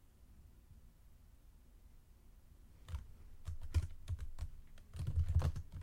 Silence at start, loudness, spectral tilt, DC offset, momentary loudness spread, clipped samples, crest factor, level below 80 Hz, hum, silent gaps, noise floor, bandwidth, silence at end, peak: 0.2 s; -43 LUFS; -7 dB/octave; under 0.1%; 27 LU; under 0.1%; 20 dB; -48 dBFS; none; none; -62 dBFS; 12.5 kHz; 0 s; -22 dBFS